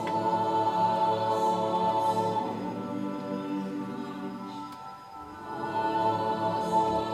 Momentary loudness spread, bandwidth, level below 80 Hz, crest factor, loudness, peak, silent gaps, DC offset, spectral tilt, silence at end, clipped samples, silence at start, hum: 13 LU; 14 kHz; -64 dBFS; 14 dB; -29 LUFS; -14 dBFS; none; under 0.1%; -6 dB/octave; 0 s; under 0.1%; 0 s; none